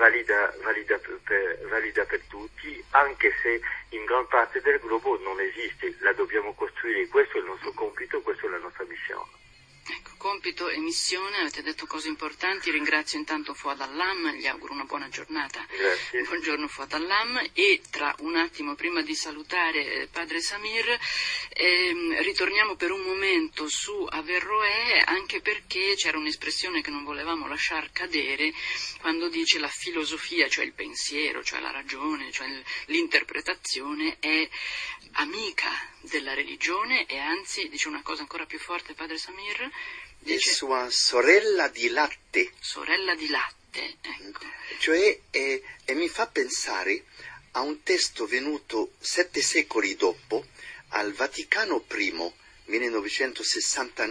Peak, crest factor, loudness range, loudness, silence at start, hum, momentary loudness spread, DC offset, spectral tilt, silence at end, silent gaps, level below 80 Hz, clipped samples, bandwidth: -4 dBFS; 24 dB; 5 LU; -26 LUFS; 0 s; none; 11 LU; under 0.1%; -0.5 dB/octave; 0 s; none; -60 dBFS; under 0.1%; 10.5 kHz